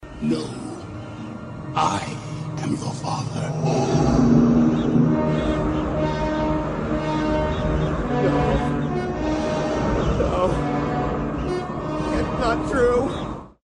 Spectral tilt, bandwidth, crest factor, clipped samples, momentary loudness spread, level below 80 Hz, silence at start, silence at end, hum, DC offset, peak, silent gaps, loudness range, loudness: -7 dB/octave; 10.5 kHz; 16 dB; under 0.1%; 12 LU; -34 dBFS; 0 s; 0.15 s; none; under 0.1%; -6 dBFS; none; 5 LU; -22 LUFS